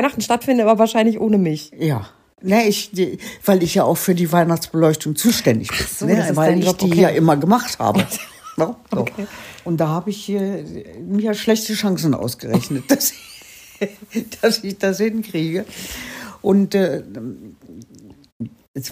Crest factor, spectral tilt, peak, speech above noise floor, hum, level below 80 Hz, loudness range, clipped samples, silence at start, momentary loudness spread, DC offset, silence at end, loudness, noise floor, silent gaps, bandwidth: 16 dB; -5 dB/octave; -2 dBFS; 26 dB; none; -50 dBFS; 6 LU; under 0.1%; 0 s; 15 LU; under 0.1%; 0 s; -18 LUFS; -44 dBFS; 18.32-18.40 s, 18.68-18.74 s; 15.5 kHz